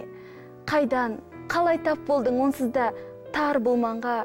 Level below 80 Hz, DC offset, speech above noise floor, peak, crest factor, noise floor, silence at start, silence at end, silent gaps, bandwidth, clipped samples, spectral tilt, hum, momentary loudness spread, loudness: -58 dBFS; under 0.1%; 20 dB; -14 dBFS; 12 dB; -44 dBFS; 0 s; 0 s; none; 16.5 kHz; under 0.1%; -5.5 dB/octave; none; 16 LU; -25 LUFS